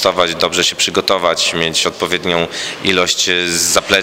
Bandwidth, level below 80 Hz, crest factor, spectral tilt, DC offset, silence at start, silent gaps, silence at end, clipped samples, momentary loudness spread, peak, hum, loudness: 16 kHz; -50 dBFS; 16 dB; -1.5 dB/octave; under 0.1%; 0 s; none; 0 s; under 0.1%; 4 LU; 0 dBFS; none; -14 LUFS